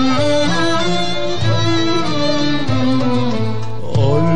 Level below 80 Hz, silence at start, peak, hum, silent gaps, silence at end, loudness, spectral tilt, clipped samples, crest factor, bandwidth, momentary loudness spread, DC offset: -40 dBFS; 0 s; -4 dBFS; none; none; 0 s; -17 LUFS; -5.5 dB/octave; under 0.1%; 10 dB; 10 kHz; 5 LU; 10%